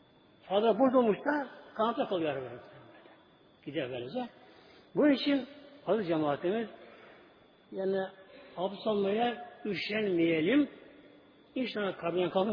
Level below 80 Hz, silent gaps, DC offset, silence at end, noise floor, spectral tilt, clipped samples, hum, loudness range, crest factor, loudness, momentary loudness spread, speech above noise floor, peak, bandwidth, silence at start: -74 dBFS; none; under 0.1%; 0 s; -61 dBFS; -8 dB/octave; under 0.1%; none; 4 LU; 18 dB; -31 LUFS; 16 LU; 31 dB; -14 dBFS; 5.2 kHz; 0.45 s